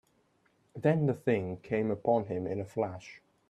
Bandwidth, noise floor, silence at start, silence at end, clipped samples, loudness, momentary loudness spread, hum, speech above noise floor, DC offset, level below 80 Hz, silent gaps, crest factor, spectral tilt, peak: 11 kHz; -71 dBFS; 0.75 s; 0.3 s; under 0.1%; -32 LUFS; 12 LU; none; 40 dB; under 0.1%; -68 dBFS; none; 20 dB; -8.5 dB/octave; -12 dBFS